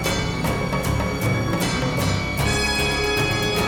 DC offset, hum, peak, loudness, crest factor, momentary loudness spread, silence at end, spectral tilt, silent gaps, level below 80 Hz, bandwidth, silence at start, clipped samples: under 0.1%; none; -8 dBFS; -22 LUFS; 12 dB; 3 LU; 0 s; -4.5 dB/octave; none; -32 dBFS; over 20 kHz; 0 s; under 0.1%